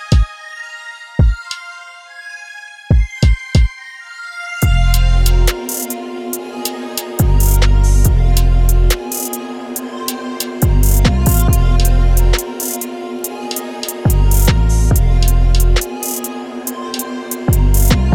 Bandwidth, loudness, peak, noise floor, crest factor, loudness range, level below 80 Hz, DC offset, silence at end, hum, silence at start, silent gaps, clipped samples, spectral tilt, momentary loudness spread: 17.5 kHz; -16 LUFS; 0 dBFS; -35 dBFS; 12 dB; 3 LU; -14 dBFS; under 0.1%; 0 s; none; 0 s; none; under 0.1%; -5 dB/octave; 15 LU